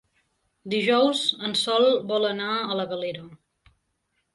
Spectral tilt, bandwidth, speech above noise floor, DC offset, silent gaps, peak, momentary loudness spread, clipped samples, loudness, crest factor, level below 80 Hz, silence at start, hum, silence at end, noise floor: -4 dB/octave; 11.5 kHz; 51 dB; under 0.1%; none; -8 dBFS; 10 LU; under 0.1%; -23 LUFS; 18 dB; -70 dBFS; 0.65 s; none; 1 s; -75 dBFS